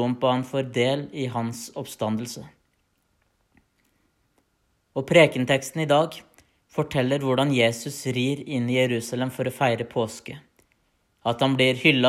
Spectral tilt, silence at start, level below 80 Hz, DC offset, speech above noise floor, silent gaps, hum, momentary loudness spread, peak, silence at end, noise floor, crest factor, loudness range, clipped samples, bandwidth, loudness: -5 dB/octave; 0 s; -64 dBFS; under 0.1%; 47 dB; none; none; 15 LU; -4 dBFS; 0 s; -70 dBFS; 22 dB; 11 LU; under 0.1%; 15 kHz; -24 LUFS